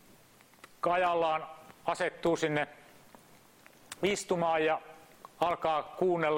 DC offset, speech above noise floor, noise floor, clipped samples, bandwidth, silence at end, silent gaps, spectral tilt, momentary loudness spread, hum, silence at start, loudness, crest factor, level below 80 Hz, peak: under 0.1%; 30 dB; -60 dBFS; under 0.1%; 16.5 kHz; 0 s; none; -4.5 dB/octave; 10 LU; none; 0.85 s; -31 LUFS; 20 dB; -68 dBFS; -14 dBFS